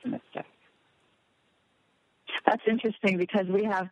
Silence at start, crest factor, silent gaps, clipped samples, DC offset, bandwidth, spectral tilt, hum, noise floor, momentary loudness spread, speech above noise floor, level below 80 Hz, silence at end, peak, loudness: 0.05 s; 26 dB; none; under 0.1%; under 0.1%; 10 kHz; -7 dB/octave; none; -70 dBFS; 16 LU; 43 dB; -76 dBFS; 0.05 s; -4 dBFS; -28 LUFS